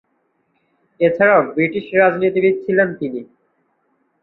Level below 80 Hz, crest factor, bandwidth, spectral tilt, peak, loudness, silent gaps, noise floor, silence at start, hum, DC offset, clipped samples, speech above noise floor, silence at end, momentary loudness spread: -64 dBFS; 18 dB; 4.2 kHz; -10 dB/octave; -2 dBFS; -16 LUFS; none; -66 dBFS; 1 s; none; under 0.1%; under 0.1%; 50 dB; 1 s; 10 LU